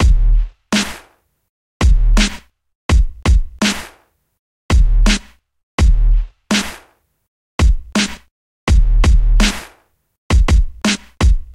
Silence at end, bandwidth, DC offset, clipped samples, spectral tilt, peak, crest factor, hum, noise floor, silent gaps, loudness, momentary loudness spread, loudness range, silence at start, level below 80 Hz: 0.1 s; 12.5 kHz; under 0.1%; under 0.1%; -4.5 dB/octave; -2 dBFS; 14 dB; none; -52 dBFS; 1.49-1.80 s, 2.75-2.89 s, 4.39-4.69 s, 5.63-5.78 s, 7.28-7.58 s, 8.31-8.67 s, 10.18-10.30 s; -17 LUFS; 12 LU; 2 LU; 0 s; -14 dBFS